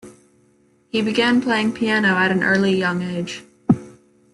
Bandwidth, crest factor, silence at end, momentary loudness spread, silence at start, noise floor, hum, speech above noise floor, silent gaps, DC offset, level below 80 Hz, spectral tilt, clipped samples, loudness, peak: 11.5 kHz; 18 dB; 0.4 s; 9 LU; 0.05 s; -58 dBFS; none; 39 dB; none; under 0.1%; -58 dBFS; -5.5 dB/octave; under 0.1%; -19 LUFS; -4 dBFS